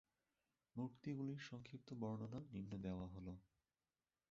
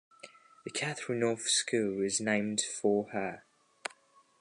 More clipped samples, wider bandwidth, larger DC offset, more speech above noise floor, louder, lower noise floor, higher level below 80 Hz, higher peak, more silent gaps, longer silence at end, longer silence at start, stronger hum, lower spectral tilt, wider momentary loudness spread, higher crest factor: neither; second, 7.6 kHz vs 11.5 kHz; neither; first, over 40 dB vs 31 dB; second, -51 LUFS vs -32 LUFS; first, under -90 dBFS vs -63 dBFS; first, -70 dBFS vs -76 dBFS; second, -34 dBFS vs -16 dBFS; neither; second, 0.85 s vs 1 s; first, 0.75 s vs 0.25 s; neither; first, -7.5 dB/octave vs -3 dB/octave; second, 8 LU vs 17 LU; about the same, 18 dB vs 18 dB